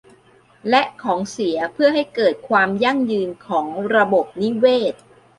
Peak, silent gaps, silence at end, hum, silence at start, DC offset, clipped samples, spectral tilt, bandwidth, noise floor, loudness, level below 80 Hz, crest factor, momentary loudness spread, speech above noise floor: -2 dBFS; none; 0.45 s; none; 0.65 s; under 0.1%; under 0.1%; -5 dB/octave; 11.5 kHz; -52 dBFS; -19 LUFS; -62 dBFS; 18 dB; 7 LU; 34 dB